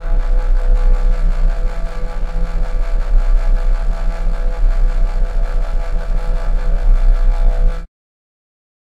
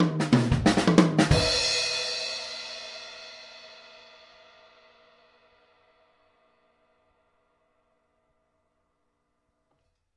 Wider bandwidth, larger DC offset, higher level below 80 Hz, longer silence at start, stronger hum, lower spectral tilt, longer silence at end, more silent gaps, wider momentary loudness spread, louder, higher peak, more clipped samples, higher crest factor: second, 4.8 kHz vs 11.5 kHz; neither; first, -14 dBFS vs -46 dBFS; about the same, 0 s vs 0 s; neither; first, -7 dB/octave vs -4.5 dB/octave; second, 1 s vs 6.45 s; neither; second, 6 LU vs 24 LU; first, -21 LUFS vs -24 LUFS; about the same, -2 dBFS vs 0 dBFS; neither; second, 12 dB vs 28 dB